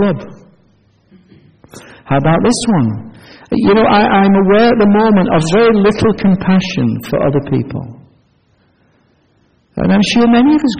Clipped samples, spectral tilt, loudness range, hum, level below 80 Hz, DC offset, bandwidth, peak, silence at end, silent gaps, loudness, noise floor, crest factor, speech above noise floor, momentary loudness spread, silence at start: under 0.1%; -6.5 dB/octave; 8 LU; none; -38 dBFS; under 0.1%; 9.4 kHz; 0 dBFS; 0 s; none; -11 LUFS; -54 dBFS; 12 dB; 44 dB; 9 LU; 0 s